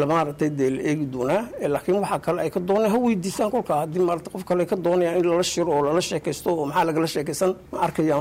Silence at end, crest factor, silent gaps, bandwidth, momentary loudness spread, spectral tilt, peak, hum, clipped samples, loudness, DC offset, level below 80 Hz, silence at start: 0 s; 10 dB; none; 16 kHz; 5 LU; -5.5 dB/octave; -12 dBFS; none; under 0.1%; -23 LUFS; under 0.1%; -54 dBFS; 0 s